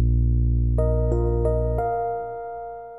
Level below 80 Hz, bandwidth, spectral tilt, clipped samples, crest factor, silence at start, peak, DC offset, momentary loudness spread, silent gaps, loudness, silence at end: -24 dBFS; 2.2 kHz; -12 dB/octave; under 0.1%; 12 dB; 0 s; -8 dBFS; 0.4%; 11 LU; none; -24 LUFS; 0 s